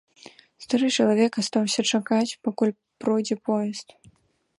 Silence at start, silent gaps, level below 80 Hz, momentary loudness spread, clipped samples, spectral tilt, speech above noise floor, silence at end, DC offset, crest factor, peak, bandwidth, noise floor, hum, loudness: 0.6 s; none; -72 dBFS; 7 LU; under 0.1%; -4 dB/octave; 27 dB; 0.75 s; under 0.1%; 18 dB; -8 dBFS; 11.5 kHz; -51 dBFS; none; -24 LUFS